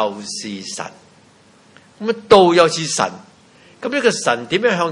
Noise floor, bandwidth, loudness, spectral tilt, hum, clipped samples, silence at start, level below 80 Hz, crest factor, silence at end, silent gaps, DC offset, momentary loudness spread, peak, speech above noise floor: -50 dBFS; 11.5 kHz; -17 LUFS; -3.5 dB/octave; none; under 0.1%; 0 s; -56 dBFS; 18 dB; 0 s; none; under 0.1%; 17 LU; 0 dBFS; 33 dB